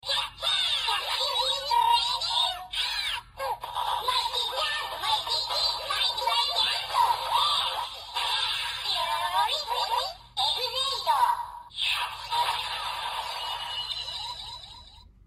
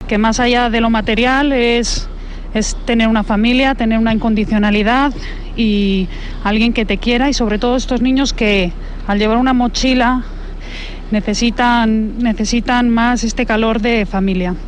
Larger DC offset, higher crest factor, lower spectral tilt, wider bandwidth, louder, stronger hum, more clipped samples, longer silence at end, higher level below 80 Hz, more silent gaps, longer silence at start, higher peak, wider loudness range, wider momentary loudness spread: neither; about the same, 16 dB vs 12 dB; second, 0.5 dB/octave vs -4.5 dB/octave; first, 15 kHz vs 10 kHz; second, -26 LUFS vs -14 LUFS; neither; neither; first, 0.2 s vs 0 s; second, -56 dBFS vs -24 dBFS; neither; about the same, 0.05 s vs 0 s; second, -12 dBFS vs -2 dBFS; about the same, 3 LU vs 1 LU; about the same, 8 LU vs 9 LU